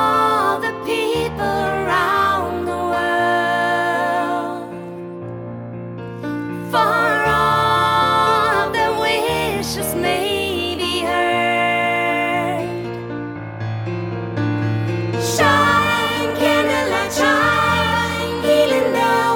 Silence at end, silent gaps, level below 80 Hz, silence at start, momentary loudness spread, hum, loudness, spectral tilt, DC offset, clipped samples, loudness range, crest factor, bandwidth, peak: 0 s; none; -44 dBFS; 0 s; 12 LU; none; -18 LUFS; -4.5 dB/octave; under 0.1%; under 0.1%; 5 LU; 16 dB; over 20 kHz; -2 dBFS